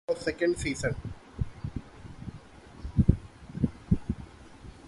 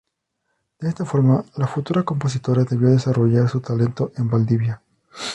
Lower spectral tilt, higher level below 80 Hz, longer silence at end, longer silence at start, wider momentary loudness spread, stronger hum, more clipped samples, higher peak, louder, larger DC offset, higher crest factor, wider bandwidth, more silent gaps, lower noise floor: about the same, -7 dB/octave vs -8 dB/octave; first, -40 dBFS vs -54 dBFS; about the same, 0 s vs 0 s; second, 0.1 s vs 0.8 s; first, 22 LU vs 9 LU; neither; neither; about the same, -4 dBFS vs -4 dBFS; second, -31 LUFS vs -20 LUFS; neither; first, 26 dB vs 16 dB; about the same, 11.5 kHz vs 11 kHz; neither; second, -49 dBFS vs -74 dBFS